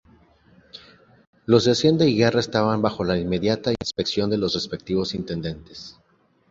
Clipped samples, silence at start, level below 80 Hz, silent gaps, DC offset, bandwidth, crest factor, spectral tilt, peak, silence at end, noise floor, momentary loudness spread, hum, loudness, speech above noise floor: under 0.1%; 0.75 s; -50 dBFS; 1.27-1.33 s; under 0.1%; 7.8 kHz; 20 dB; -5.5 dB/octave; -4 dBFS; 0.6 s; -55 dBFS; 16 LU; none; -22 LUFS; 34 dB